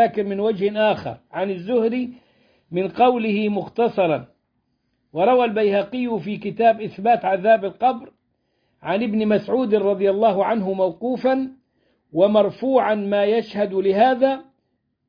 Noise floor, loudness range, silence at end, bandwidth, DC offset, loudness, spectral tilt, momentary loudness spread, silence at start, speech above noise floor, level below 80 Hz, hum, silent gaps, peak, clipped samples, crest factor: -71 dBFS; 2 LU; 0.65 s; 5.2 kHz; under 0.1%; -20 LUFS; -8.5 dB/octave; 10 LU; 0 s; 52 dB; -64 dBFS; none; none; -4 dBFS; under 0.1%; 16 dB